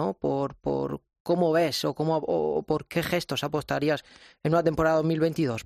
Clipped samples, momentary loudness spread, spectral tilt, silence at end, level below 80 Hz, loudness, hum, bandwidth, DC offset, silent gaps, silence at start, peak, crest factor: under 0.1%; 6 LU; -6 dB/octave; 0.05 s; -54 dBFS; -27 LUFS; none; 14 kHz; under 0.1%; 1.20-1.25 s; 0 s; -10 dBFS; 16 dB